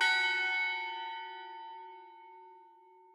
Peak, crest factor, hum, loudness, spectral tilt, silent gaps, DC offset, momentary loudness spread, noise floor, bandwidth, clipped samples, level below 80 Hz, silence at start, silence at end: -18 dBFS; 20 dB; none; -32 LUFS; 2 dB/octave; none; under 0.1%; 25 LU; -60 dBFS; 14.5 kHz; under 0.1%; under -90 dBFS; 0 s; 0.45 s